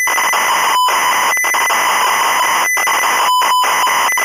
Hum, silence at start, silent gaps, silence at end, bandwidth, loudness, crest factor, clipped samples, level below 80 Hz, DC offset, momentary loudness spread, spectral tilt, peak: none; 0 s; none; 0 s; 16 kHz; -12 LUFS; 8 dB; under 0.1%; -60 dBFS; under 0.1%; 1 LU; 1.5 dB/octave; -6 dBFS